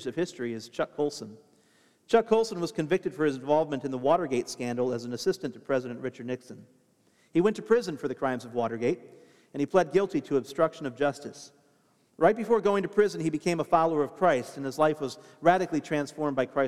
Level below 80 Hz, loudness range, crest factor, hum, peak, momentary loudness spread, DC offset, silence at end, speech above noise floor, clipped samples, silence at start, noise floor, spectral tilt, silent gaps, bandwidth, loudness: -68 dBFS; 4 LU; 20 dB; none; -8 dBFS; 11 LU; under 0.1%; 0 s; 39 dB; under 0.1%; 0 s; -66 dBFS; -6 dB/octave; none; 14 kHz; -28 LUFS